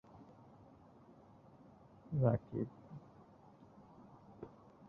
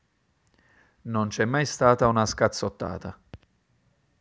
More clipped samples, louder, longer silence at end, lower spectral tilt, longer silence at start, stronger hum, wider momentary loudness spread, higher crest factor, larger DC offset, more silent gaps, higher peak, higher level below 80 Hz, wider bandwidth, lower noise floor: neither; second, -38 LUFS vs -24 LUFS; second, 0.4 s vs 0.85 s; first, -11 dB/octave vs -5 dB/octave; second, 0.15 s vs 1.05 s; neither; first, 27 LU vs 16 LU; about the same, 26 dB vs 24 dB; neither; neither; second, -18 dBFS vs -4 dBFS; second, -68 dBFS vs -50 dBFS; second, 3.3 kHz vs 8 kHz; second, -62 dBFS vs -69 dBFS